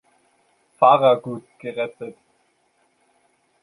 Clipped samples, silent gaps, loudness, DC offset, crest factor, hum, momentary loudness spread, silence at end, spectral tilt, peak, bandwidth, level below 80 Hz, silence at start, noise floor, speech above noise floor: under 0.1%; none; -19 LUFS; under 0.1%; 22 dB; none; 21 LU; 1.5 s; -6.5 dB/octave; -2 dBFS; 11 kHz; -72 dBFS; 0.8 s; -65 dBFS; 46 dB